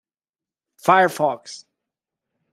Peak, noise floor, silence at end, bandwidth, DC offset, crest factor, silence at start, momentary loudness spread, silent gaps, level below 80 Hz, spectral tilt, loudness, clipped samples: -2 dBFS; under -90 dBFS; 0.95 s; 16 kHz; under 0.1%; 22 dB; 0.85 s; 22 LU; none; -70 dBFS; -4.5 dB/octave; -19 LUFS; under 0.1%